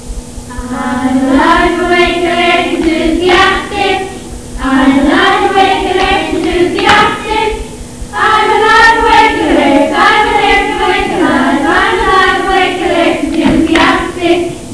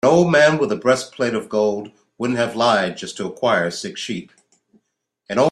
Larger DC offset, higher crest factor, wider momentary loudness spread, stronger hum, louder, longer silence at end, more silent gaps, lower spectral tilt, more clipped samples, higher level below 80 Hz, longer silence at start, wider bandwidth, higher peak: first, 2% vs under 0.1%; second, 10 dB vs 18 dB; second, 9 LU vs 14 LU; neither; first, -9 LUFS vs -19 LUFS; about the same, 0 s vs 0 s; neither; about the same, -4 dB/octave vs -5 dB/octave; first, 0.8% vs under 0.1%; first, -28 dBFS vs -60 dBFS; about the same, 0 s vs 0.05 s; second, 11 kHz vs 12.5 kHz; about the same, 0 dBFS vs -2 dBFS